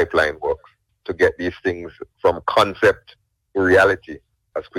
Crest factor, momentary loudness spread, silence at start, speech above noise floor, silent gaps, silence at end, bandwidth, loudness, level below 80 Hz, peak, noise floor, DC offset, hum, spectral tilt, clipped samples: 20 dB; 17 LU; 0 s; 32 dB; none; 0 s; 15.5 kHz; -19 LUFS; -48 dBFS; 0 dBFS; -51 dBFS; under 0.1%; none; -5 dB/octave; under 0.1%